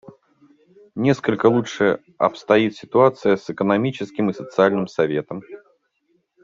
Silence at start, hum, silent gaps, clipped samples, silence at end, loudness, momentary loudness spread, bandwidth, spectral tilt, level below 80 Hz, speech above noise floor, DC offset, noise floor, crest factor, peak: 0.95 s; none; none; under 0.1%; 0.85 s; -20 LUFS; 7 LU; 7.6 kHz; -7 dB/octave; -62 dBFS; 48 dB; under 0.1%; -67 dBFS; 18 dB; -2 dBFS